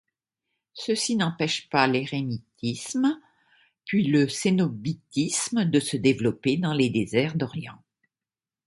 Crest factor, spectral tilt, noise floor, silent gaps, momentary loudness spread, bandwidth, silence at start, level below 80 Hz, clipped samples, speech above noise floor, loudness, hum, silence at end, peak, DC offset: 20 dB; -5 dB/octave; under -90 dBFS; none; 10 LU; 11.5 kHz; 0.75 s; -64 dBFS; under 0.1%; over 65 dB; -25 LUFS; none; 0.9 s; -6 dBFS; under 0.1%